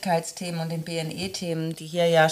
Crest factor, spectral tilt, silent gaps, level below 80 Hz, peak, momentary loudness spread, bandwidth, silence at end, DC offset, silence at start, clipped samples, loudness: 18 dB; -4.5 dB/octave; none; -64 dBFS; -6 dBFS; 9 LU; 15.5 kHz; 0 s; under 0.1%; 0 s; under 0.1%; -27 LUFS